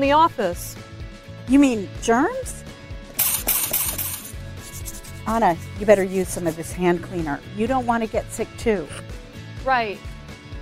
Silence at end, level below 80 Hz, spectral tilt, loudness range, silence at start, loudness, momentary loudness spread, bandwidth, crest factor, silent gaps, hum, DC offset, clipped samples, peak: 0 s; -40 dBFS; -4.5 dB/octave; 4 LU; 0 s; -22 LUFS; 20 LU; 16 kHz; 22 dB; none; none; under 0.1%; under 0.1%; -2 dBFS